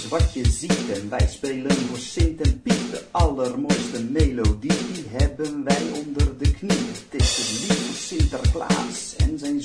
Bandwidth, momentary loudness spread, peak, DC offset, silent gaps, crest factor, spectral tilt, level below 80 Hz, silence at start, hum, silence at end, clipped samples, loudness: 10.5 kHz; 6 LU; -6 dBFS; under 0.1%; none; 16 dB; -5 dB/octave; -26 dBFS; 0 s; none; 0 s; under 0.1%; -23 LUFS